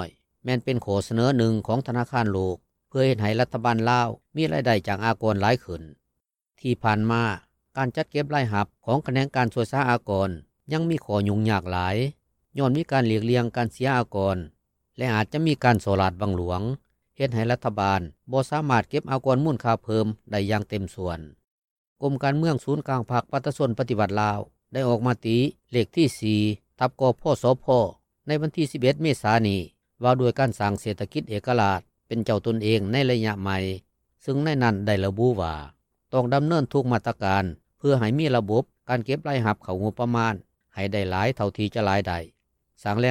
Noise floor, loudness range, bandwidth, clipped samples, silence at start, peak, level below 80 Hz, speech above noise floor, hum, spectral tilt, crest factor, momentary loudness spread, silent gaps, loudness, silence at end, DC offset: -81 dBFS; 3 LU; 14 kHz; under 0.1%; 0 s; -6 dBFS; -56 dBFS; 57 dB; none; -7 dB/octave; 18 dB; 8 LU; 21.44-21.96 s; -25 LUFS; 0 s; under 0.1%